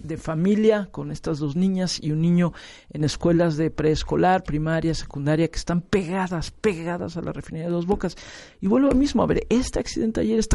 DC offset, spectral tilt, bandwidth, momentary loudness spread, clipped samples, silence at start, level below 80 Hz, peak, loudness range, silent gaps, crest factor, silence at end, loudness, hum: under 0.1%; -6.5 dB/octave; 11.5 kHz; 11 LU; under 0.1%; 0 s; -38 dBFS; -6 dBFS; 3 LU; none; 16 dB; 0 s; -23 LUFS; none